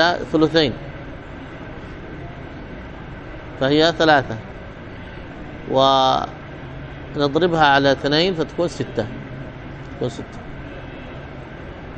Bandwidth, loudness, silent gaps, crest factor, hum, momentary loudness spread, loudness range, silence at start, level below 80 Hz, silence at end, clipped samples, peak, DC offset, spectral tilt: 8.4 kHz; -18 LUFS; none; 20 dB; none; 20 LU; 9 LU; 0 s; -42 dBFS; 0 s; under 0.1%; 0 dBFS; under 0.1%; -5.5 dB/octave